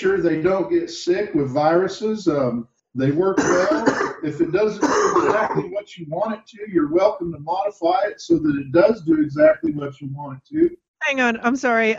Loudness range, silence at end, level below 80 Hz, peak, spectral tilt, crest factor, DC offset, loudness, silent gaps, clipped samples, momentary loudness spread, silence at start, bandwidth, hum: 2 LU; 0 s; -54 dBFS; -2 dBFS; -5.5 dB/octave; 16 dB; under 0.1%; -20 LUFS; 10.88-10.94 s; under 0.1%; 12 LU; 0 s; 7.8 kHz; none